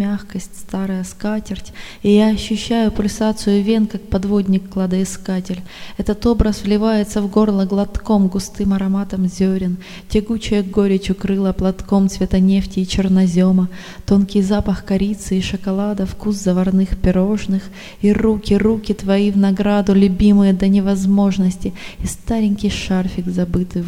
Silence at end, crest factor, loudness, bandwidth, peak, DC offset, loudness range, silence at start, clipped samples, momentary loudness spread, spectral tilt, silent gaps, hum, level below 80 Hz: 0 s; 16 dB; -17 LUFS; 12.5 kHz; 0 dBFS; 0.5%; 4 LU; 0 s; under 0.1%; 9 LU; -7 dB/octave; none; none; -32 dBFS